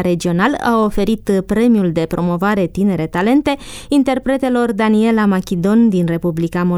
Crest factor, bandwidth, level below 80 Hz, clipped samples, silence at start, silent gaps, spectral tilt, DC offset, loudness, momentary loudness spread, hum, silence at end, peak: 12 dB; 15 kHz; -38 dBFS; under 0.1%; 0 s; none; -7 dB/octave; under 0.1%; -15 LUFS; 5 LU; none; 0 s; -2 dBFS